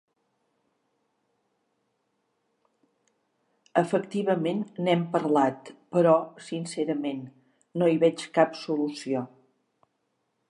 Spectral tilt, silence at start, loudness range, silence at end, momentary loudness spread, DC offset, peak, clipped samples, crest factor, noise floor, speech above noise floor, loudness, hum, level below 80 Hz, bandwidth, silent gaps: -6.5 dB/octave; 3.75 s; 6 LU; 1.25 s; 13 LU; under 0.1%; -6 dBFS; under 0.1%; 24 dB; -76 dBFS; 51 dB; -26 LUFS; none; -82 dBFS; 11.5 kHz; none